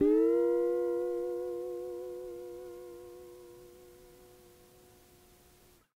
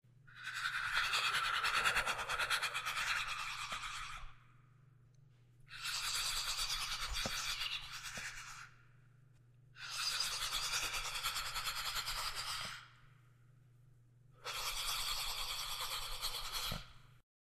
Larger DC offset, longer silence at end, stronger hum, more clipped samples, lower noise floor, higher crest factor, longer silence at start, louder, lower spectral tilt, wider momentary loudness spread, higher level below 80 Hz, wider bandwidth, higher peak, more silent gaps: neither; first, 1.75 s vs 0.25 s; neither; neither; about the same, -62 dBFS vs -65 dBFS; about the same, 18 dB vs 22 dB; second, 0 s vs 0.25 s; first, -33 LUFS vs -38 LUFS; first, -6.5 dB/octave vs 0.5 dB/octave; first, 26 LU vs 12 LU; second, -66 dBFS vs -56 dBFS; about the same, 16 kHz vs 15.5 kHz; about the same, -18 dBFS vs -20 dBFS; neither